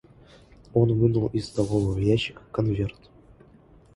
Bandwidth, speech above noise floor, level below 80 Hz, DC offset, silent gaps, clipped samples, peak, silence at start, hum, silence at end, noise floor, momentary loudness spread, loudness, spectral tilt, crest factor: 11.5 kHz; 30 dB; -46 dBFS; under 0.1%; none; under 0.1%; -8 dBFS; 0.75 s; none; 1.05 s; -54 dBFS; 8 LU; -25 LUFS; -7.5 dB/octave; 18 dB